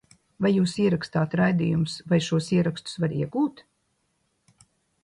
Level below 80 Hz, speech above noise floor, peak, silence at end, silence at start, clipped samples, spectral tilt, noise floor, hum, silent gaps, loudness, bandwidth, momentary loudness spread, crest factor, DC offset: -58 dBFS; 49 dB; -10 dBFS; 1.45 s; 0.4 s; under 0.1%; -6.5 dB/octave; -72 dBFS; none; none; -25 LUFS; 11.5 kHz; 6 LU; 16 dB; under 0.1%